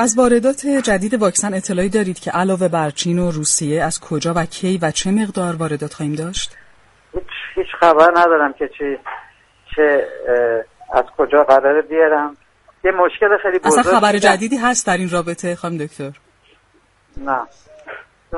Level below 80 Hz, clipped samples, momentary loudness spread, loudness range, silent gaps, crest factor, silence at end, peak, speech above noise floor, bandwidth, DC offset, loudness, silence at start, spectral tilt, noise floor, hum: -44 dBFS; under 0.1%; 15 LU; 6 LU; none; 16 dB; 0 s; 0 dBFS; 40 dB; 11.5 kHz; under 0.1%; -16 LUFS; 0 s; -4 dB/octave; -56 dBFS; none